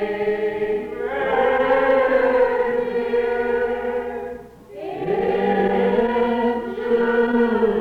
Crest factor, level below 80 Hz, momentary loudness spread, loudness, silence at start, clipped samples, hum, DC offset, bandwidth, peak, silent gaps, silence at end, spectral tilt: 12 dB; -48 dBFS; 11 LU; -20 LUFS; 0 s; under 0.1%; none; under 0.1%; 5.2 kHz; -8 dBFS; none; 0 s; -7.5 dB/octave